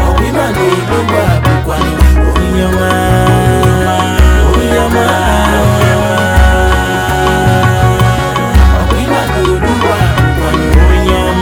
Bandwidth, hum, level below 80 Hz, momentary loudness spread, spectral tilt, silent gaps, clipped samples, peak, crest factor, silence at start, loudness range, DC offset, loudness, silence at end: 17 kHz; none; -14 dBFS; 3 LU; -6 dB/octave; none; 0.6%; 0 dBFS; 8 dB; 0 s; 1 LU; under 0.1%; -10 LUFS; 0 s